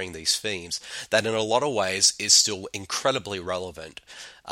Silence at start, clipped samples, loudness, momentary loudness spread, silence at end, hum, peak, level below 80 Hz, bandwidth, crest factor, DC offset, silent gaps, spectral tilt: 0 s; under 0.1%; -23 LUFS; 23 LU; 0 s; none; -4 dBFS; -60 dBFS; 16.5 kHz; 22 dB; under 0.1%; none; -1 dB/octave